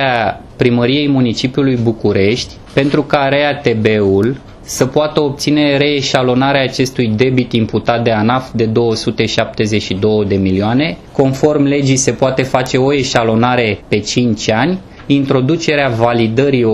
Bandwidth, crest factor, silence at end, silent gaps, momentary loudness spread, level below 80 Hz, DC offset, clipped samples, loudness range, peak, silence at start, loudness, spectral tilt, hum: 14 kHz; 12 dB; 0 s; none; 4 LU; -40 dBFS; under 0.1%; under 0.1%; 1 LU; 0 dBFS; 0 s; -13 LUFS; -5.5 dB/octave; none